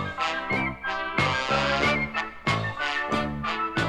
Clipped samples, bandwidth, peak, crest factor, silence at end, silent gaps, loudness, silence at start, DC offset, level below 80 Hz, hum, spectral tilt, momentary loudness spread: under 0.1%; 13.5 kHz; -10 dBFS; 16 dB; 0 s; none; -26 LUFS; 0 s; under 0.1%; -46 dBFS; none; -4.5 dB/octave; 6 LU